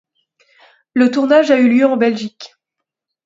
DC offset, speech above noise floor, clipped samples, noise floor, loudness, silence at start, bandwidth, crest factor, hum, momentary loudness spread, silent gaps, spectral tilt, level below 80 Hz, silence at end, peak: under 0.1%; 67 dB; under 0.1%; -80 dBFS; -13 LUFS; 0.95 s; 7.6 kHz; 16 dB; none; 12 LU; none; -5.5 dB/octave; -66 dBFS; 0.8 s; 0 dBFS